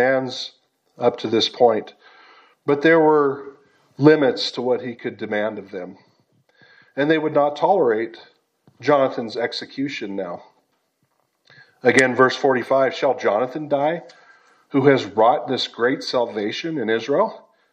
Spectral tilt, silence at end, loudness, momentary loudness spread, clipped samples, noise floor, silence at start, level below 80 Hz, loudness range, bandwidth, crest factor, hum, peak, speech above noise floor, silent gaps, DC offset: -5.5 dB/octave; 0.35 s; -20 LUFS; 14 LU; under 0.1%; -69 dBFS; 0 s; -76 dBFS; 5 LU; 9.8 kHz; 20 dB; none; 0 dBFS; 49 dB; none; under 0.1%